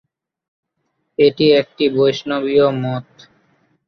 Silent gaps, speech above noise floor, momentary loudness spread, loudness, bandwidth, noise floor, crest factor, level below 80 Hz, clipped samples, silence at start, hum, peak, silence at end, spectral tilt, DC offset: none; 56 dB; 11 LU; -16 LUFS; 6.4 kHz; -71 dBFS; 16 dB; -60 dBFS; under 0.1%; 1.2 s; none; -2 dBFS; 0.85 s; -6.5 dB/octave; under 0.1%